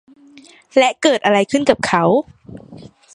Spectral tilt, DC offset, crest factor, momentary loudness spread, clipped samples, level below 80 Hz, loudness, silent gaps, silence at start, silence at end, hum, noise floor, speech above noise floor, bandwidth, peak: -4.5 dB/octave; under 0.1%; 18 dB; 7 LU; under 0.1%; -54 dBFS; -15 LUFS; none; 0.75 s; 0.25 s; none; -45 dBFS; 29 dB; 11.5 kHz; 0 dBFS